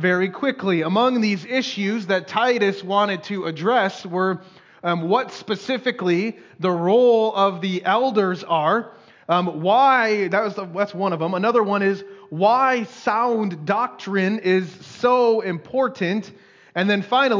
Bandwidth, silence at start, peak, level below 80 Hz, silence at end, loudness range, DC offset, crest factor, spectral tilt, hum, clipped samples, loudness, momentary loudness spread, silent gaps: 7.6 kHz; 0 s; -6 dBFS; -74 dBFS; 0 s; 3 LU; under 0.1%; 14 dB; -6 dB/octave; none; under 0.1%; -21 LUFS; 9 LU; none